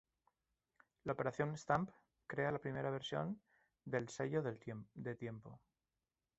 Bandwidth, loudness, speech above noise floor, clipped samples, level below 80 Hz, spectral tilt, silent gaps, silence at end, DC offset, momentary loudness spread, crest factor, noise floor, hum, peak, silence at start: 8 kHz; -43 LUFS; over 48 dB; under 0.1%; -74 dBFS; -5.5 dB/octave; none; 0.8 s; under 0.1%; 12 LU; 24 dB; under -90 dBFS; none; -20 dBFS; 1.05 s